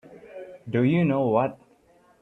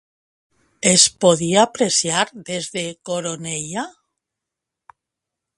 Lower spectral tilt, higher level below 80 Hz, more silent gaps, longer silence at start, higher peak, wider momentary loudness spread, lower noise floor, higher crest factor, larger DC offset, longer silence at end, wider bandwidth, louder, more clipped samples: first, -10 dB/octave vs -2.5 dB/octave; about the same, -64 dBFS vs -62 dBFS; neither; second, 0.1 s vs 0.85 s; second, -8 dBFS vs 0 dBFS; first, 21 LU vs 15 LU; second, -59 dBFS vs -84 dBFS; about the same, 18 dB vs 22 dB; neither; second, 0.65 s vs 1.7 s; second, 4.1 kHz vs 11.5 kHz; second, -24 LUFS vs -18 LUFS; neither